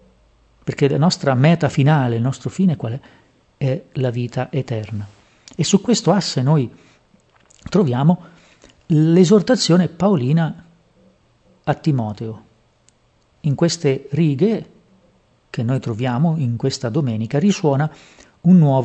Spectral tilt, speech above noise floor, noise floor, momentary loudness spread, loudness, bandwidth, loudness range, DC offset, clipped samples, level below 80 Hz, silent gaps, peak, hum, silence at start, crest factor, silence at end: -6.5 dB/octave; 42 dB; -59 dBFS; 13 LU; -18 LUFS; 8.8 kHz; 6 LU; under 0.1%; under 0.1%; -56 dBFS; none; 0 dBFS; none; 0.65 s; 18 dB; 0 s